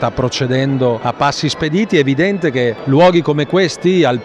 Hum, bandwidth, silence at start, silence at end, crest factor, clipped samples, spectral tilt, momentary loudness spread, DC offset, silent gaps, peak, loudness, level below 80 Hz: none; 10.5 kHz; 0 s; 0 s; 12 dB; under 0.1%; -6 dB/octave; 6 LU; under 0.1%; none; -2 dBFS; -14 LUFS; -44 dBFS